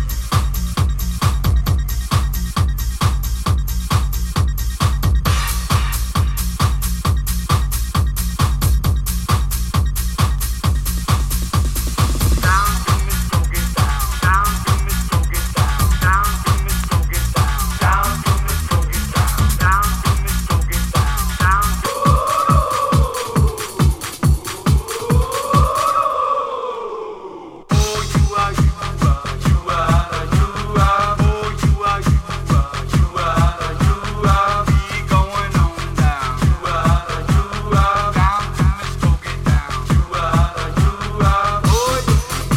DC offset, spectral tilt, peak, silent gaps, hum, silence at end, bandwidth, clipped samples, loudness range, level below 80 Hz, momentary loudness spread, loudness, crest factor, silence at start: under 0.1%; -5 dB/octave; -2 dBFS; none; none; 0 s; 16.5 kHz; under 0.1%; 2 LU; -20 dBFS; 4 LU; -18 LUFS; 14 dB; 0 s